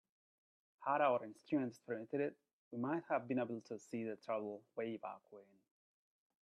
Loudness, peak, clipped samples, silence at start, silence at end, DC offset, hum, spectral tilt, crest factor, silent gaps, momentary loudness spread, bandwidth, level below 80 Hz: -42 LUFS; -22 dBFS; under 0.1%; 0.8 s; 1 s; under 0.1%; none; -7 dB/octave; 20 dB; 2.53-2.71 s; 12 LU; 12.5 kHz; -90 dBFS